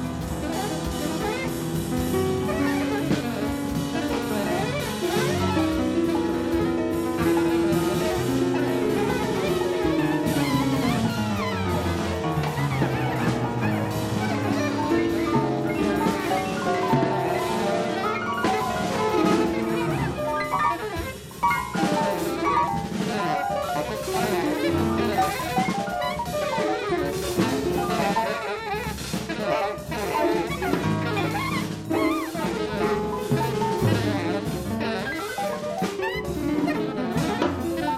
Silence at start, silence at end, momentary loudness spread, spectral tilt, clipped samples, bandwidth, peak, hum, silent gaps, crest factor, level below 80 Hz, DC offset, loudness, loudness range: 0 s; 0 s; 5 LU; -5.5 dB/octave; under 0.1%; 16 kHz; -8 dBFS; none; none; 16 dB; -44 dBFS; under 0.1%; -25 LUFS; 2 LU